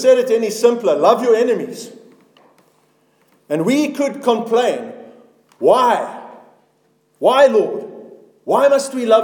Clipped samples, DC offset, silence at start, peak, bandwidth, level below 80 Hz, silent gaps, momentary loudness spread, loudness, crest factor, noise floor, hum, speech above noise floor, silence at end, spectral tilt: under 0.1%; under 0.1%; 0 s; 0 dBFS; 18.5 kHz; -72 dBFS; none; 16 LU; -15 LUFS; 16 dB; -60 dBFS; none; 46 dB; 0 s; -4.5 dB/octave